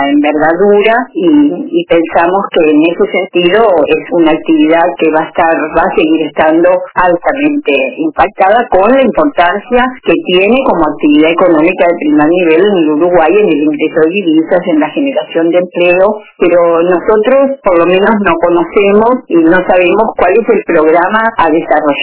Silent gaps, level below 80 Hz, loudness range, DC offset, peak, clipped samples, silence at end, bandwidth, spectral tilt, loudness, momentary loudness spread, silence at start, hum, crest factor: none; -40 dBFS; 1 LU; under 0.1%; 0 dBFS; 0.8%; 0 s; 4 kHz; -9.5 dB/octave; -8 LUFS; 4 LU; 0 s; none; 8 dB